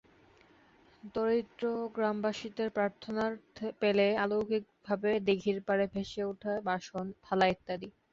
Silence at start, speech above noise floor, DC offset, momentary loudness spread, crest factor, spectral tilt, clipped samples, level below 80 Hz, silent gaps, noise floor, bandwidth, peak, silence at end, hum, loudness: 1.05 s; 30 dB; under 0.1%; 10 LU; 18 dB; -6 dB/octave; under 0.1%; -66 dBFS; none; -63 dBFS; 7.6 kHz; -14 dBFS; 0.2 s; none; -33 LUFS